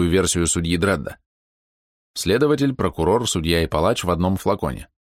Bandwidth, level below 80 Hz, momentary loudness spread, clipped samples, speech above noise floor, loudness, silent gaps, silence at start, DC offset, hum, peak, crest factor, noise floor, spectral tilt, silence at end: 16.5 kHz; -38 dBFS; 8 LU; under 0.1%; over 70 dB; -20 LUFS; 1.26-2.14 s; 0 s; under 0.1%; none; -6 dBFS; 16 dB; under -90 dBFS; -4.5 dB/octave; 0.25 s